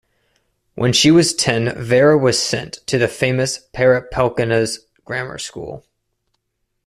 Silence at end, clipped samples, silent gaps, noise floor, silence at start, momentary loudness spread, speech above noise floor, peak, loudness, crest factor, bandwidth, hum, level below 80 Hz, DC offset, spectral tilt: 1.05 s; under 0.1%; none; -73 dBFS; 0.75 s; 15 LU; 56 dB; 0 dBFS; -16 LUFS; 18 dB; 14 kHz; none; -48 dBFS; under 0.1%; -4.5 dB/octave